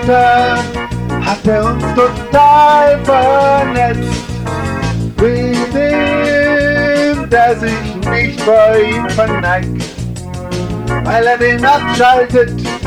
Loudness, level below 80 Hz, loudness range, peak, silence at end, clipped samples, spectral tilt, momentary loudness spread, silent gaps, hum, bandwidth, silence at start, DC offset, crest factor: -12 LUFS; -30 dBFS; 3 LU; 0 dBFS; 0 s; under 0.1%; -6 dB/octave; 11 LU; none; none; 19.5 kHz; 0 s; under 0.1%; 12 dB